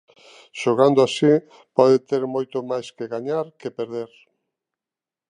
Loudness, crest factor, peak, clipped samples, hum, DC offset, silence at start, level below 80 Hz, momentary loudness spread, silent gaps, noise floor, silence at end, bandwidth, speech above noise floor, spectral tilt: -21 LUFS; 20 dB; -2 dBFS; under 0.1%; none; under 0.1%; 0.55 s; -74 dBFS; 14 LU; none; -90 dBFS; 1.25 s; 10.5 kHz; 69 dB; -6 dB/octave